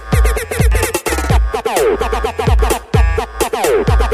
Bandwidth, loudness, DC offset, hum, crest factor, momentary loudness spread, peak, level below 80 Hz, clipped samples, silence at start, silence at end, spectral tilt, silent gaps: 16 kHz; -15 LUFS; 0.1%; none; 12 dB; 3 LU; 0 dBFS; -16 dBFS; under 0.1%; 0 s; 0 s; -5 dB/octave; none